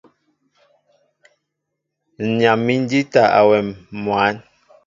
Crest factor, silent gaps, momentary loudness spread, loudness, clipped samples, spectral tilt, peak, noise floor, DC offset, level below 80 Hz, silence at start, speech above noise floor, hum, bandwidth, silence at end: 20 dB; none; 14 LU; -17 LUFS; under 0.1%; -6.5 dB/octave; 0 dBFS; -78 dBFS; under 0.1%; -58 dBFS; 2.2 s; 62 dB; none; 7.6 kHz; 0.45 s